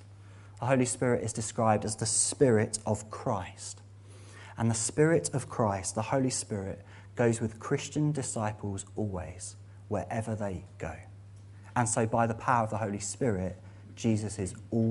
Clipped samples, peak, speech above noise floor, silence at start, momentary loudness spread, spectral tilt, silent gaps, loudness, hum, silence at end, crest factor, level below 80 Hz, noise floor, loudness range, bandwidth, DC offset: under 0.1%; -10 dBFS; 20 dB; 0 s; 19 LU; -5 dB/octave; none; -30 LUFS; none; 0 s; 20 dB; -58 dBFS; -50 dBFS; 6 LU; 11.5 kHz; under 0.1%